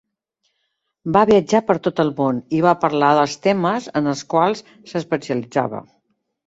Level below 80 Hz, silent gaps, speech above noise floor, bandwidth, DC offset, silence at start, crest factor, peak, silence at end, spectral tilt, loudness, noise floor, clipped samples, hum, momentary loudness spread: -56 dBFS; none; 55 dB; 8 kHz; under 0.1%; 1.05 s; 18 dB; -2 dBFS; 0.65 s; -6 dB/octave; -18 LUFS; -73 dBFS; under 0.1%; none; 12 LU